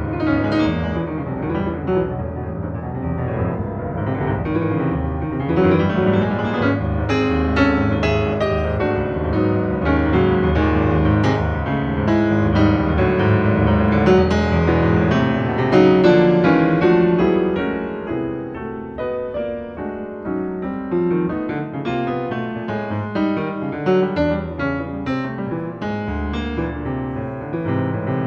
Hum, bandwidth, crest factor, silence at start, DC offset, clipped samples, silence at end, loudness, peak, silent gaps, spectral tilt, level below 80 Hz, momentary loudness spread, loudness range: none; 7.2 kHz; 16 dB; 0 s; under 0.1%; under 0.1%; 0 s; -19 LUFS; -2 dBFS; none; -8.5 dB/octave; -32 dBFS; 11 LU; 9 LU